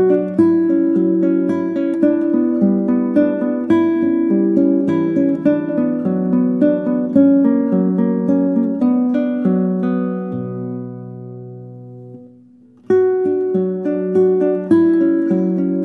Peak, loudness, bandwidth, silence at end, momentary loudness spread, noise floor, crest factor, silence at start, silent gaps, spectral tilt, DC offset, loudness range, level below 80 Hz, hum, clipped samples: -2 dBFS; -16 LUFS; 3.9 kHz; 0 s; 11 LU; -46 dBFS; 14 dB; 0 s; none; -10.5 dB/octave; under 0.1%; 6 LU; -64 dBFS; none; under 0.1%